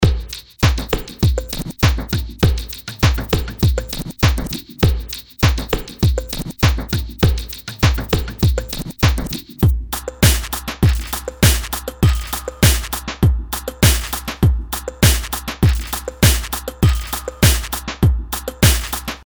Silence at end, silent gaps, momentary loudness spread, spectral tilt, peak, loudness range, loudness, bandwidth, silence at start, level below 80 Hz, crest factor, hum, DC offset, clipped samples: 0.05 s; none; 10 LU; -4.5 dB/octave; 0 dBFS; 2 LU; -18 LUFS; over 20 kHz; 0 s; -22 dBFS; 18 dB; none; under 0.1%; under 0.1%